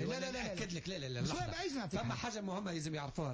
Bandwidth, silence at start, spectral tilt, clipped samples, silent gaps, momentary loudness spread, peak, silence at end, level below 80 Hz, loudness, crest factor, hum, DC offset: 8 kHz; 0 s; -5 dB/octave; under 0.1%; none; 3 LU; -28 dBFS; 0 s; -58 dBFS; -40 LUFS; 12 dB; none; under 0.1%